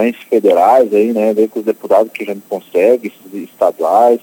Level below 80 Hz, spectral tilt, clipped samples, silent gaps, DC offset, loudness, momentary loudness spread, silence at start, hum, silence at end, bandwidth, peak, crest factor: -68 dBFS; -6 dB/octave; under 0.1%; none; under 0.1%; -13 LUFS; 14 LU; 0 s; none; 0.05 s; 18 kHz; 0 dBFS; 12 dB